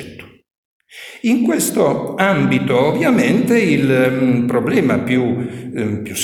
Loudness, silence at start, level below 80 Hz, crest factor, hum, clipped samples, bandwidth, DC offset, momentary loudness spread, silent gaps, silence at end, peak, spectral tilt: -16 LUFS; 0 s; -52 dBFS; 16 dB; none; under 0.1%; 19 kHz; under 0.1%; 9 LU; 0.57-0.80 s; 0 s; 0 dBFS; -5.5 dB/octave